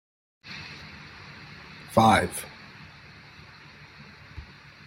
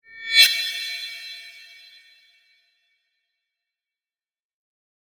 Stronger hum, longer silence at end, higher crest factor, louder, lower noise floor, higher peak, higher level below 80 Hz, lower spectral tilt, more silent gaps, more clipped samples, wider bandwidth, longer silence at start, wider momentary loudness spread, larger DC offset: neither; second, 0.45 s vs 3.4 s; about the same, 26 dB vs 26 dB; second, -24 LUFS vs -18 LUFS; second, -49 dBFS vs under -90 dBFS; second, -6 dBFS vs 0 dBFS; first, -56 dBFS vs -86 dBFS; first, -5 dB/octave vs 5 dB/octave; neither; neither; second, 16 kHz vs 19.5 kHz; first, 0.45 s vs 0.15 s; first, 27 LU vs 24 LU; neither